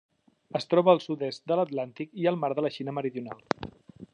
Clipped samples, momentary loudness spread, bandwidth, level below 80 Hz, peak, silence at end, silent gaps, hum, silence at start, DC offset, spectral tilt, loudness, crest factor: under 0.1%; 12 LU; 9.8 kHz; -66 dBFS; -6 dBFS; 0.1 s; none; none; 0.55 s; under 0.1%; -7 dB/octave; -28 LUFS; 24 dB